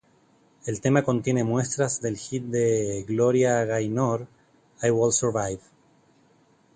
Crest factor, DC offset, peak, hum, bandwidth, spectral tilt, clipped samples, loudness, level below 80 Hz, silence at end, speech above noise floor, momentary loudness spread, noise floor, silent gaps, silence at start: 20 dB; under 0.1%; -6 dBFS; none; 9.6 kHz; -5.5 dB/octave; under 0.1%; -25 LUFS; -58 dBFS; 1.15 s; 37 dB; 10 LU; -61 dBFS; none; 0.65 s